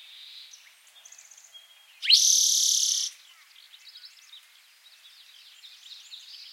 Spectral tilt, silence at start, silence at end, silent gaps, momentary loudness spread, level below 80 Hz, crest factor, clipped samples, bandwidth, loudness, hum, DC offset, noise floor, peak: 10.5 dB/octave; 0.2 s; 0.05 s; none; 28 LU; under -90 dBFS; 24 dB; under 0.1%; 16.5 kHz; -20 LUFS; none; under 0.1%; -56 dBFS; -6 dBFS